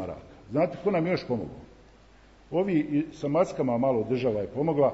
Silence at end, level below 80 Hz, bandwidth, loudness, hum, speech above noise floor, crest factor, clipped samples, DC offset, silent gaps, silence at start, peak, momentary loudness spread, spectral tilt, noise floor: 0 s; -56 dBFS; 8 kHz; -27 LUFS; none; 28 dB; 16 dB; under 0.1%; under 0.1%; none; 0 s; -12 dBFS; 8 LU; -8 dB/octave; -55 dBFS